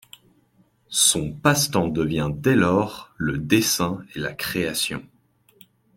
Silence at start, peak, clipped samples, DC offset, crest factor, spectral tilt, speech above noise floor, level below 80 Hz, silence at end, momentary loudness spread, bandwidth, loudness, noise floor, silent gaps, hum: 0.9 s; -2 dBFS; under 0.1%; under 0.1%; 22 dB; -3.5 dB/octave; 39 dB; -50 dBFS; 0.9 s; 11 LU; 16.5 kHz; -22 LUFS; -61 dBFS; none; none